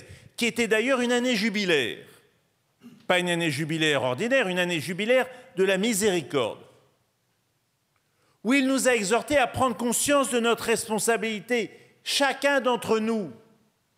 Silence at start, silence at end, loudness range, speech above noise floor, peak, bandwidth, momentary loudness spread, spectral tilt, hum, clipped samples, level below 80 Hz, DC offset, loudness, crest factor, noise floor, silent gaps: 0 s; 0.6 s; 4 LU; 48 dB; -8 dBFS; 16 kHz; 7 LU; -3.5 dB/octave; none; under 0.1%; -62 dBFS; under 0.1%; -24 LUFS; 18 dB; -72 dBFS; none